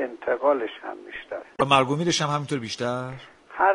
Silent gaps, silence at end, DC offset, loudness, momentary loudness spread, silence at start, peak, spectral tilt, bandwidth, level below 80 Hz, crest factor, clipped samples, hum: none; 0 s; under 0.1%; -24 LUFS; 17 LU; 0 s; -4 dBFS; -4.5 dB/octave; 11.5 kHz; -62 dBFS; 22 dB; under 0.1%; none